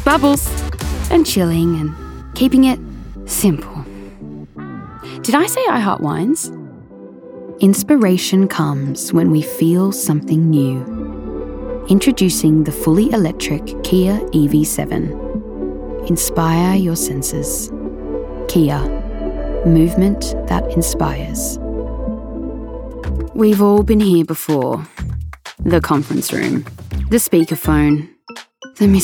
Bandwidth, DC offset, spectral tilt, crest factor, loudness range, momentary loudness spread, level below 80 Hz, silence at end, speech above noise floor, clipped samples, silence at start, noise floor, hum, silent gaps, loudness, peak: 19.5 kHz; under 0.1%; -5.5 dB/octave; 14 dB; 4 LU; 16 LU; -30 dBFS; 0 s; 23 dB; under 0.1%; 0 s; -37 dBFS; none; none; -16 LUFS; -2 dBFS